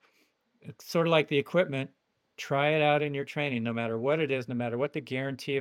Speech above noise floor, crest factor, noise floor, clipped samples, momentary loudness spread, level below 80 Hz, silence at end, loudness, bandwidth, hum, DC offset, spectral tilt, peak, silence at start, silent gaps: 42 dB; 20 dB; -70 dBFS; under 0.1%; 9 LU; -82 dBFS; 0 s; -29 LUFS; 16.5 kHz; none; under 0.1%; -6 dB/octave; -10 dBFS; 0.65 s; none